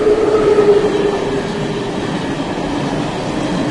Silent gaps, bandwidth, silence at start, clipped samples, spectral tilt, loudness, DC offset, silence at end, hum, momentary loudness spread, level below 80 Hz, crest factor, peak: none; 11.5 kHz; 0 s; under 0.1%; -6 dB/octave; -16 LUFS; under 0.1%; 0 s; none; 9 LU; -38 dBFS; 14 dB; 0 dBFS